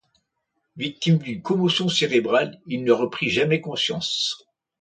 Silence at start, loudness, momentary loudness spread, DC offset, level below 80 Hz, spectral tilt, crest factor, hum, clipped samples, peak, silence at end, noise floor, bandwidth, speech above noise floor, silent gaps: 0.75 s; -22 LUFS; 8 LU; under 0.1%; -62 dBFS; -5 dB/octave; 20 dB; none; under 0.1%; -4 dBFS; 0.45 s; -76 dBFS; 9.2 kHz; 54 dB; none